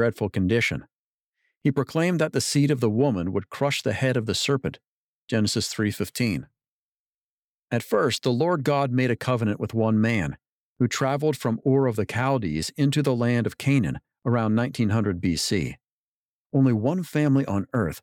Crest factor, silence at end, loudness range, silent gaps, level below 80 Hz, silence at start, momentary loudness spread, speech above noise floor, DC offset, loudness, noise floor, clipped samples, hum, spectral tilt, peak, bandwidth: 14 dB; 0.05 s; 3 LU; 0.95-1.32 s, 1.57-1.61 s, 4.87-5.27 s, 6.68-7.63 s, 10.49-10.76 s, 15.92-16.50 s; -54 dBFS; 0 s; 6 LU; over 67 dB; under 0.1%; -24 LUFS; under -90 dBFS; under 0.1%; none; -5.5 dB/octave; -10 dBFS; 18 kHz